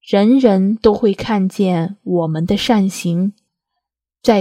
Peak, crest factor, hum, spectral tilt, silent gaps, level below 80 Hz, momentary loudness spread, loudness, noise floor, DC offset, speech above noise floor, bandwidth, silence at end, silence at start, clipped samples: 0 dBFS; 16 dB; none; -6.5 dB/octave; none; -46 dBFS; 8 LU; -16 LUFS; -78 dBFS; under 0.1%; 63 dB; 15 kHz; 0 s; 0.05 s; under 0.1%